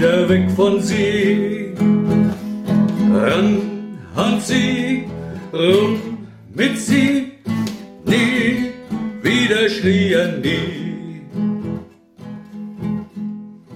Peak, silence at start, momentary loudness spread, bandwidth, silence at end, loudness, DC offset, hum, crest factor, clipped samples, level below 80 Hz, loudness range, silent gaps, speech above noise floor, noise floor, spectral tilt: -2 dBFS; 0 s; 15 LU; 15 kHz; 0 s; -18 LUFS; under 0.1%; none; 16 dB; under 0.1%; -50 dBFS; 4 LU; none; 22 dB; -38 dBFS; -5.5 dB/octave